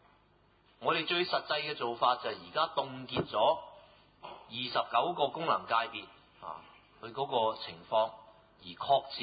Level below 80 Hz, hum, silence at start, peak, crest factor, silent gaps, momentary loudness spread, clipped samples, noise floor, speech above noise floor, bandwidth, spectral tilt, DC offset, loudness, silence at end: -70 dBFS; none; 0.8 s; -14 dBFS; 20 dB; none; 19 LU; under 0.1%; -67 dBFS; 34 dB; 5 kHz; -7.5 dB/octave; under 0.1%; -32 LUFS; 0 s